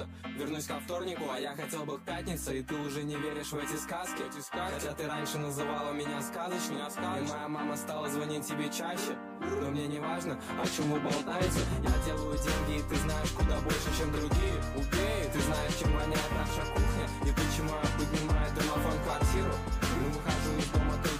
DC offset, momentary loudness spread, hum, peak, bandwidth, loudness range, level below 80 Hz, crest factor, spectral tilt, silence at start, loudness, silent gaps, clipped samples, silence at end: under 0.1%; 6 LU; none; -14 dBFS; 15.5 kHz; 5 LU; -38 dBFS; 18 dB; -5 dB/octave; 0 s; -33 LUFS; none; under 0.1%; 0 s